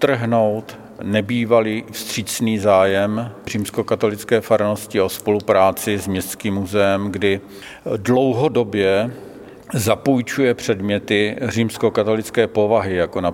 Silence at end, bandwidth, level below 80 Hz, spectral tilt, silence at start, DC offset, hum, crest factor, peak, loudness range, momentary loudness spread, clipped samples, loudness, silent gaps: 0 s; 17 kHz; -54 dBFS; -5.5 dB/octave; 0 s; under 0.1%; none; 18 dB; -2 dBFS; 1 LU; 10 LU; under 0.1%; -19 LUFS; none